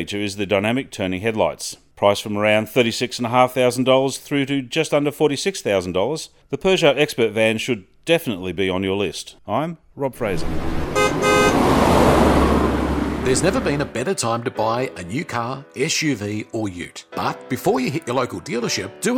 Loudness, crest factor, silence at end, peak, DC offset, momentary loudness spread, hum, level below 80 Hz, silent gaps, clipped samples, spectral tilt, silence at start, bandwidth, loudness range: -20 LUFS; 20 dB; 0 s; 0 dBFS; under 0.1%; 10 LU; none; -34 dBFS; none; under 0.1%; -4.5 dB/octave; 0 s; 18 kHz; 6 LU